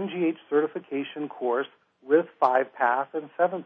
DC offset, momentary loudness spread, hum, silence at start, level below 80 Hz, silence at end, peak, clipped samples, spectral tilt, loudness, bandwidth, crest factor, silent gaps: under 0.1%; 9 LU; none; 0 s; under -90 dBFS; 0 s; -8 dBFS; under 0.1%; -8 dB/octave; -26 LUFS; 5.4 kHz; 18 dB; none